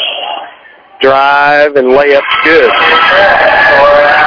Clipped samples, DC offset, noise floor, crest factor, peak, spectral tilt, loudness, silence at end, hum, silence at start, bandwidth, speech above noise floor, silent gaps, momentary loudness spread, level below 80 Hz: 5%; under 0.1%; -36 dBFS; 6 dB; 0 dBFS; -4.5 dB/octave; -5 LUFS; 0 s; none; 0 s; 5.4 kHz; 30 dB; none; 8 LU; -40 dBFS